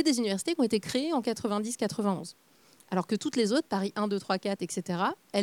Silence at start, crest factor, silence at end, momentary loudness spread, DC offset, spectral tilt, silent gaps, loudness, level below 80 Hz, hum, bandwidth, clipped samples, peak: 0 s; 20 dB; 0 s; 6 LU; under 0.1%; -4.5 dB/octave; none; -30 LUFS; -72 dBFS; none; 18 kHz; under 0.1%; -10 dBFS